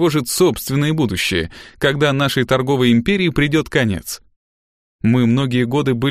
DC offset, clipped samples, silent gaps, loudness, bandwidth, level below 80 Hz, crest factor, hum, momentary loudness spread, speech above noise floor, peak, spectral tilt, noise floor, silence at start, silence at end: under 0.1%; under 0.1%; 4.36-4.99 s; -17 LUFS; 15.5 kHz; -42 dBFS; 16 dB; none; 7 LU; over 74 dB; 0 dBFS; -5.5 dB/octave; under -90 dBFS; 0 s; 0 s